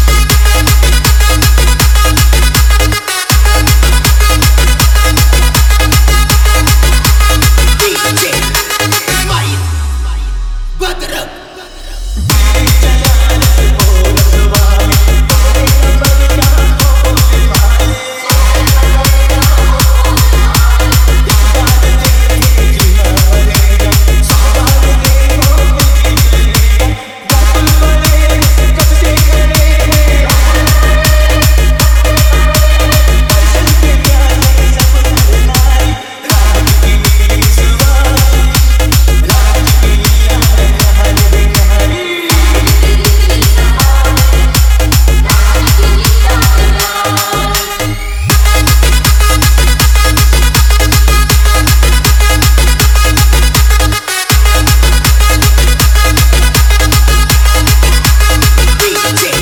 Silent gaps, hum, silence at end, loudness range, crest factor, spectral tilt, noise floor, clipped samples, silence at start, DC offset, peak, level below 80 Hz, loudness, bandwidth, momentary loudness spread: none; none; 0 s; 2 LU; 6 dB; -4 dB/octave; -28 dBFS; 0.6%; 0 s; under 0.1%; 0 dBFS; -8 dBFS; -8 LUFS; 19.5 kHz; 3 LU